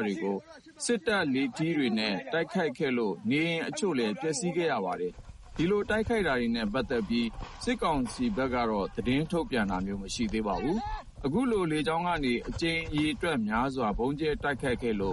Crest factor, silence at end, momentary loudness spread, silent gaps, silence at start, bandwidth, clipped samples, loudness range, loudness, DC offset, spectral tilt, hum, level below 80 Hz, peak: 16 dB; 0 s; 5 LU; none; 0 s; 11.5 kHz; under 0.1%; 1 LU; -30 LUFS; under 0.1%; -5 dB/octave; none; -46 dBFS; -14 dBFS